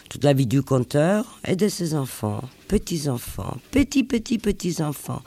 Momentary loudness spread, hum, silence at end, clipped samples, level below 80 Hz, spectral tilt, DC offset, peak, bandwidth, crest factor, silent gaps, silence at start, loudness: 8 LU; none; 0.05 s; under 0.1%; -42 dBFS; -6 dB/octave; under 0.1%; -6 dBFS; 15.5 kHz; 18 dB; none; 0.1 s; -23 LUFS